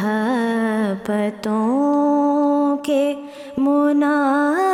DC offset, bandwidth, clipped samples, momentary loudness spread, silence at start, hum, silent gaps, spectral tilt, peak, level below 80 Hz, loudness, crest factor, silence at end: under 0.1%; 14 kHz; under 0.1%; 5 LU; 0 s; none; none; -6.5 dB/octave; -8 dBFS; -64 dBFS; -19 LUFS; 10 dB; 0 s